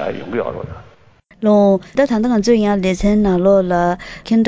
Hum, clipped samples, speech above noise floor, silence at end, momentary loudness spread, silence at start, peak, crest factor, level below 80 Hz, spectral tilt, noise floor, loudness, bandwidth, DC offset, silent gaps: none; under 0.1%; 34 dB; 0 s; 11 LU; 0 s; -2 dBFS; 14 dB; -36 dBFS; -7 dB/octave; -49 dBFS; -15 LUFS; 8 kHz; under 0.1%; none